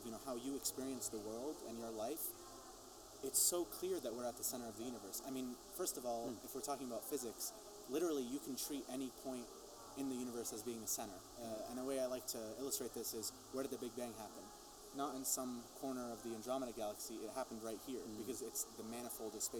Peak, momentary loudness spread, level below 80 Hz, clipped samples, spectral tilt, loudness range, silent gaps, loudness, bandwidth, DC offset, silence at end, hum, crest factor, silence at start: -22 dBFS; 9 LU; -72 dBFS; under 0.1%; -2.5 dB/octave; 4 LU; none; -44 LUFS; over 20 kHz; under 0.1%; 0 s; none; 22 dB; 0 s